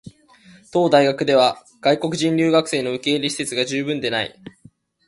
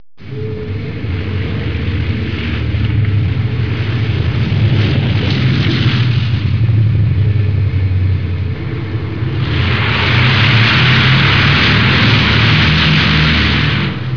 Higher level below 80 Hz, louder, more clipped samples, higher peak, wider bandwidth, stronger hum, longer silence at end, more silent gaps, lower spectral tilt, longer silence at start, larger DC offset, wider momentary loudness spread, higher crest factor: second, -62 dBFS vs -26 dBFS; second, -19 LUFS vs -13 LUFS; neither; about the same, -2 dBFS vs 0 dBFS; first, 11.5 kHz vs 5.4 kHz; neither; first, 0.6 s vs 0 s; neither; second, -4.5 dB/octave vs -6.5 dB/octave; second, 0.05 s vs 0.2 s; second, under 0.1% vs 3%; second, 7 LU vs 11 LU; first, 18 dB vs 12 dB